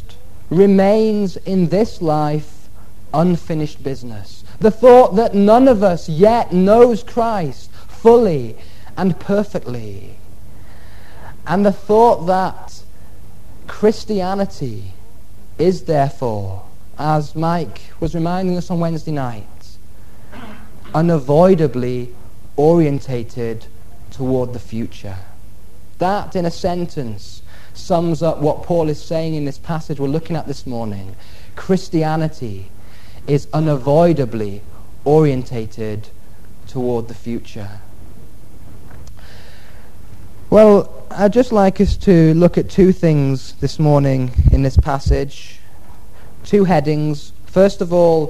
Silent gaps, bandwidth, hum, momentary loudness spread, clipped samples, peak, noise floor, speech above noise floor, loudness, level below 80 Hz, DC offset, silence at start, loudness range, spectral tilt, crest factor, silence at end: none; 13.5 kHz; none; 19 LU; under 0.1%; 0 dBFS; -42 dBFS; 27 dB; -16 LUFS; -32 dBFS; 6%; 0 s; 10 LU; -8 dB/octave; 18 dB; 0 s